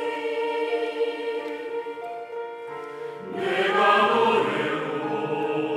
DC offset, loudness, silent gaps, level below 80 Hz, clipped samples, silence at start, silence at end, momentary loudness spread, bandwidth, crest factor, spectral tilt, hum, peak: under 0.1%; -25 LUFS; none; -82 dBFS; under 0.1%; 0 s; 0 s; 16 LU; 11.5 kHz; 18 dB; -5 dB/octave; none; -6 dBFS